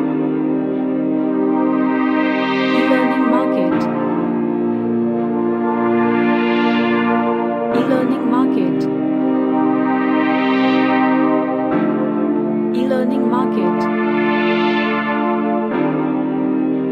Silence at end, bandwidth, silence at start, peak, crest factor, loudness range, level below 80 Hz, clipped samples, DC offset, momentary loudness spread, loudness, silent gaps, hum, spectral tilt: 0 s; 6 kHz; 0 s; -2 dBFS; 14 dB; 1 LU; -60 dBFS; under 0.1%; under 0.1%; 4 LU; -17 LUFS; none; none; -8 dB/octave